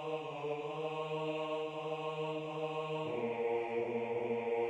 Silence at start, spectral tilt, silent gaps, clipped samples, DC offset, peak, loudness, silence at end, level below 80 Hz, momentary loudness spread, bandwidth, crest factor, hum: 0 s; -6.5 dB/octave; none; under 0.1%; under 0.1%; -26 dBFS; -38 LUFS; 0 s; -80 dBFS; 4 LU; 8.6 kHz; 12 dB; none